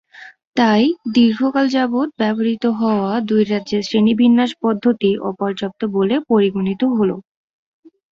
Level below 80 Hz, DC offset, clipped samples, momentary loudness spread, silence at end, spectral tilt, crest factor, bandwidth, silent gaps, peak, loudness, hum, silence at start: -58 dBFS; under 0.1%; under 0.1%; 7 LU; 0.9 s; -6.5 dB/octave; 16 dB; 7.2 kHz; 0.47-0.53 s; -2 dBFS; -17 LUFS; none; 0.2 s